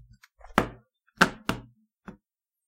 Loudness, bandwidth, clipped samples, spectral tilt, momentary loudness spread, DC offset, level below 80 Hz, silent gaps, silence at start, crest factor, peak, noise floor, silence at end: -28 LUFS; 16 kHz; under 0.1%; -4 dB/octave; 26 LU; under 0.1%; -52 dBFS; none; 0.45 s; 32 dB; 0 dBFS; -81 dBFS; 0.55 s